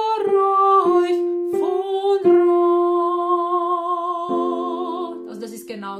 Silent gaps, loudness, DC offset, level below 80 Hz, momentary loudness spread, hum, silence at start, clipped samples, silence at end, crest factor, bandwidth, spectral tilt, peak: none; -19 LUFS; under 0.1%; -74 dBFS; 14 LU; none; 0 s; under 0.1%; 0 s; 14 dB; 12 kHz; -6 dB/octave; -6 dBFS